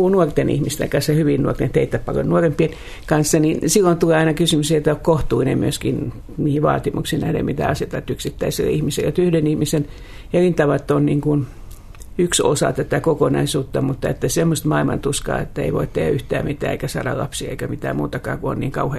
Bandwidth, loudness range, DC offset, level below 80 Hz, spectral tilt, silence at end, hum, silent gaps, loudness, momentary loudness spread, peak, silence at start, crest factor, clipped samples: 14 kHz; 4 LU; under 0.1%; -36 dBFS; -5.5 dB/octave; 0 s; none; none; -19 LUFS; 8 LU; -2 dBFS; 0 s; 18 dB; under 0.1%